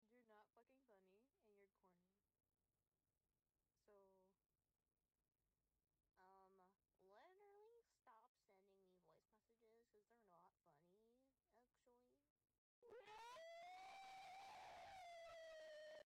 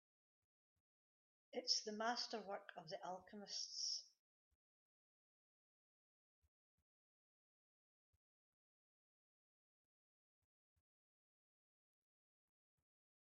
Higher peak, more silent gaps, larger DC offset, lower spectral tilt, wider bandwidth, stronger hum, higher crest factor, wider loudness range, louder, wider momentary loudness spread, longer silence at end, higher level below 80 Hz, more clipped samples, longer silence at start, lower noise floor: second, -56 dBFS vs -26 dBFS; first, 2.88-2.92 s, 8.28-8.35 s, 12.30-12.36 s, 12.58-12.82 s vs none; neither; first, -2 dB/octave vs 0 dB/octave; first, 12 kHz vs 7 kHz; neither; second, 12 dB vs 28 dB; about the same, 6 LU vs 6 LU; second, -61 LUFS vs -46 LUFS; second, 1 LU vs 12 LU; second, 0.1 s vs 9.15 s; about the same, under -90 dBFS vs under -90 dBFS; neither; second, 0 s vs 1.55 s; about the same, under -90 dBFS vs under -90 dBFS